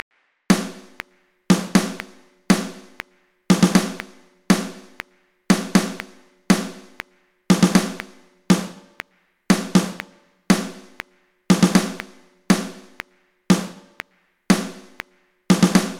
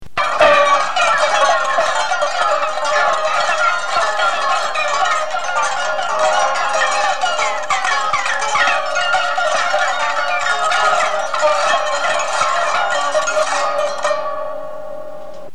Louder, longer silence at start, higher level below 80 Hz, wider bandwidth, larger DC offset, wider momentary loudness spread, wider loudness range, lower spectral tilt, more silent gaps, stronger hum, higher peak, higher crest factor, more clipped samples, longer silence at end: second, -20 LUFS vs -16 LUFS; first, 0.5 s vs 0 s; first, -52 dBFS vs -58 dBFS; first, 16 kHz vs 12.5 kHz; second, under 0.1% vs 5%; first, 23 LU vs 5 LU; about the same, 2 LU vs 2 LU; first, -5 dB/octave vs 0 dB/octave; neither; neither; about the same, 0 dBFS vs -2 dBFS; first, 22 dB vs 16 dB; neither; about the same, 0 s vs 0.05 s